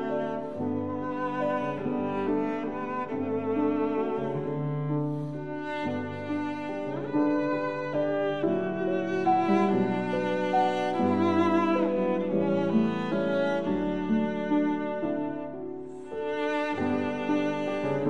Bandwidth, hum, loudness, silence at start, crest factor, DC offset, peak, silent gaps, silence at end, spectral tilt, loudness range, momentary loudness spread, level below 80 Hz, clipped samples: 8.4 kHz; none; -28 LUFS; 0 s; 16 dB; 0.4%; -12 dBFS; none; 0 s; -8 dB/octave; 5 LU; 8 LU; -62 dBFS; under 0.1%